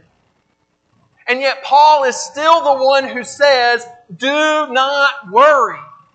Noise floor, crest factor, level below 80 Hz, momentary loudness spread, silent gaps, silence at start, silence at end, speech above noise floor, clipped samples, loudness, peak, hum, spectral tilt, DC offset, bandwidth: -63 dBFS; 14 dB; -74 dBFS; 10 LU; none; 1.25 s; 0.3 s; 50 dB; under 0.1%; -13 LUFS; 0 dBFS; none; -1.5 dB/octave; under 0.1%; 9 kHz